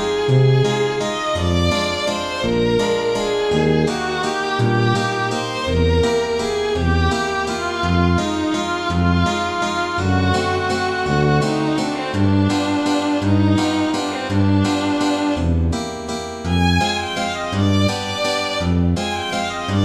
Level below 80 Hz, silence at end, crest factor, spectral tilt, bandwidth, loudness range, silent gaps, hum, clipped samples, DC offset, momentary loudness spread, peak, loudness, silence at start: -34 dBFS; 0 s; 14 dB; -5.5 dB/octave; 13 kHz; 1 LU; none; none; under 0.1%; under 0.1%; 5 LU; -4 dBFS; -19 LUFS; 0 s